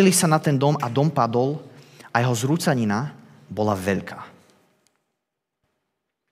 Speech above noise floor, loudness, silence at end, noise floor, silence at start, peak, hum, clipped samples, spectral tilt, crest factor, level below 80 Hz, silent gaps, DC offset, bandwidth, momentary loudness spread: 60 dB; -22 LUFS; 2 s; -81 dBFS; 0 s; -4 dBFS; none; under 0.1%; -5 dB/octave; 20 dB; -72 dBFS; none; under 0.1%; 16 kHz; 15 LU